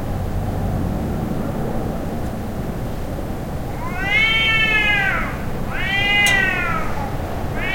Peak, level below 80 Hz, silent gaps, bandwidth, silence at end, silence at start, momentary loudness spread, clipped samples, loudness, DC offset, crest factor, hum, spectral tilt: -2 dBFS; -30 dBFS; none; 16.5 kHz; 0 s; 0 s; 13 LU; under 0.1%; -19 LUFS; under 0.1%; 18 dB; none; -4.5 dB/octave